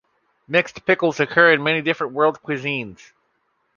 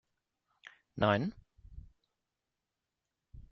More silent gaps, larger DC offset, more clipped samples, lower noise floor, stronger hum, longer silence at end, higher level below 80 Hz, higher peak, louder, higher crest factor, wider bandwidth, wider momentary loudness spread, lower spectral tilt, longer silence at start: neither; neither; neither; second, -68 dBFS vs -89 dBFS; neither; first, 0.85 s vs 0.1 s; about the same, -64 dBFS vs -60 dBFS; first, -2 dBFS vs -12 dBFS; first, -19 LUFS vs -33 LUFS; second, 20 dB vs 28 dB; about the same, 7.2 kHz vs 6.6 kHz; second, 11 LU vs 26 LU; about the same, -5.5 dB/octave vs -5 dB/octave; second, 0.5 s vs 0.65 s